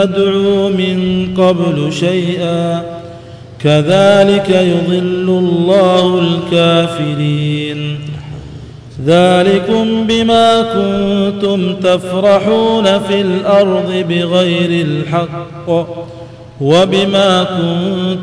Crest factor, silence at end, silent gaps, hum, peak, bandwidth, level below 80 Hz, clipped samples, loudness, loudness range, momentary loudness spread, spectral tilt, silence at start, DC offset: 12 dB; 0 s; none; none; 0 dBFS; 10.5 kHz; -44 dBFS; under 0.1%; -12 LUFS; 3 LU; 12 LU; -6.5 dB/octave; 0 s; under 0.1%